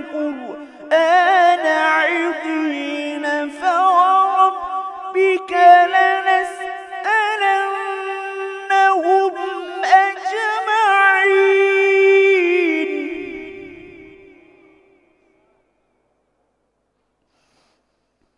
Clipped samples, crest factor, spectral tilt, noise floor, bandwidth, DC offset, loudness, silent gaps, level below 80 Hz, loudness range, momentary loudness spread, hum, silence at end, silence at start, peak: under 0.1%; 18 dB; -2 dB/octave; -69 dBFS; 11 kHz; under 0.1%; -16 LUFS; none; -66 dBFS; 4 LU; 14 LU; none; 4.35 s; 0 s; 0 dBFS